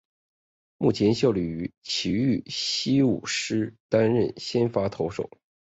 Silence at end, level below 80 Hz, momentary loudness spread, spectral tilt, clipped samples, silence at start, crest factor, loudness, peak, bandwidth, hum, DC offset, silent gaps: 0.4 s; -54 dBFS; 8 LU; -5.5 dB/octave; under 0.1%; 0.8 s; 18 dB; -25 LUFS; -8 dBFS; 8.2 kHz; none; under 0.1%; 1.78-1.82 s, 3.80-3.89 s